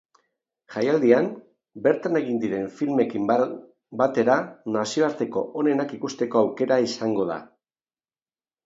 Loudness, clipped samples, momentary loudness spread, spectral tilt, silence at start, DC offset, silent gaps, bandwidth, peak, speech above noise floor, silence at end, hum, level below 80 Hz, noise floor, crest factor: -24 LUFS; under 0.1%; 9 LU; -5.5 dB/octave; 0.7 s; under 0.1%; none; 7.8 kHz; -4 dBFS; over 67 dB; 1.2 s; none; -70 dBFS; under -90 dBFS; 20 dB